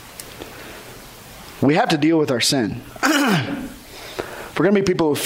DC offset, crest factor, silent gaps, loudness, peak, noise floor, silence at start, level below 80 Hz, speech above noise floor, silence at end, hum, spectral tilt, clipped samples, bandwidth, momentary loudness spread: under 0.1%; 14 dB; none; -19 LUFS; -6 dBFS; -40 dBFS; 0 s; -50 dBFS; 22 dB; 0 s; none; -4.5 dB/octave; under 0.1%; 16 kHz; 20 LU